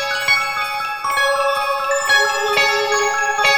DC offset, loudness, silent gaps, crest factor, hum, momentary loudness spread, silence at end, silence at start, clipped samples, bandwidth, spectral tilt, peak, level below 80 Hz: under 0.1%; -16 LUFS; none; 16 dB; none; 6 LU; 0 s; 0 s; under 0.1%; 19.5 kHz; 0.5 dB/octave; -2 dBFS; -56 dBFS